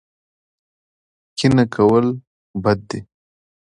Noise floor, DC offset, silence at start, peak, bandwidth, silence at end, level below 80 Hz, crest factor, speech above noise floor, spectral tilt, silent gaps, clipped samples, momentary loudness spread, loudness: under -90 dBFS; under 0.1%; 1.35 s; -2 dBFS; 11 kHz; 0.65 s; -50 dBFS; 18 dB; over 74 dB; -7 dB/octave; 2.27-2.54 s; under 0.1%; 17 LU; -17 LUFS